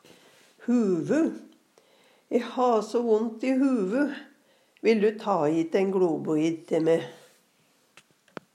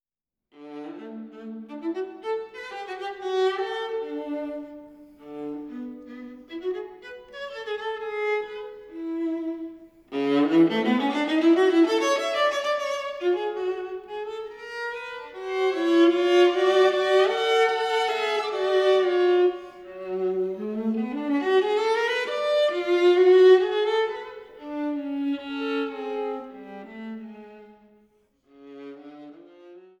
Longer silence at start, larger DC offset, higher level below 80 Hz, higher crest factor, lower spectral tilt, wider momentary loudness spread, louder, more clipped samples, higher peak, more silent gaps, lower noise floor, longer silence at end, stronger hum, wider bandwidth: about the same, 0.6 s vs 0.6 s; neither; second, -86 dBFS vs -70 dBFS; about the same, 16 dB vs 18 dB; first, -6.5 dB/octave vs -4.5 dB/octave; second, 7 LU vs 20 LU; about the same, -26 LUFS vs -24 LUFS; neither; about the same, -10 dBFS vs -8 dBFS; neither; second, -65 dBFS vs -90 dBFS; first, 1.4 s vs 0.2 s; neither; first, 12 kHz vs 10.5 kHz